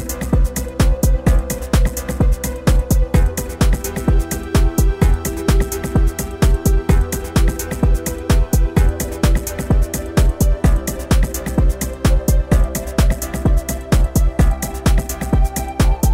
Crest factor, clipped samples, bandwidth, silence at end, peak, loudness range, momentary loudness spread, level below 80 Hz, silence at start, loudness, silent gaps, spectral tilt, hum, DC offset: 14 dB; under 0.1%; 16.5 kHz; 0 s; -2 dBFS; 1 LU; 4 LU; -16 dBFS; 0 s; -18 LUFS; none; -6 dB/octave; none; 0.5%